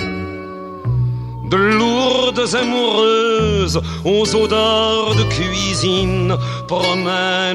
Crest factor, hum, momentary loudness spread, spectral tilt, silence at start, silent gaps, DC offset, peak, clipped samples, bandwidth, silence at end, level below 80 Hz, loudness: 14 dB; none; 8 LU; -4.5 dB/octave; 0 s; none; under 0.1%; -4 dBFS; under 0.1%; 12.5 kHz; 0 s; -34 dBFS; -16 LUFS